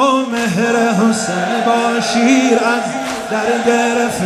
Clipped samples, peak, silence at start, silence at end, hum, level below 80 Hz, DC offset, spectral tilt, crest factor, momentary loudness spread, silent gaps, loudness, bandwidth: under 0.1%; 0 dBFS; 0 s; 0 s; none; -54 dBFS; under 0.1%; -4 dB/octave; 14 dB; 6 LU; none; -14 LUFS; 15.5 kHz